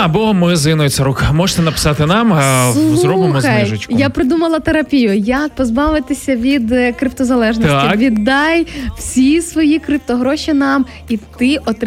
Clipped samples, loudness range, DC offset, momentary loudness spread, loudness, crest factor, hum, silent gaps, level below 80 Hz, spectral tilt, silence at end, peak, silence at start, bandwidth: under 0.1%; 2 LU; under 0.1%; 5 LU; -13 LUFS; 10 dB; none; none; -32 dBFS; -5.5 dB/octave; 0 s; -2 dBFS; 0 s; 16 kHz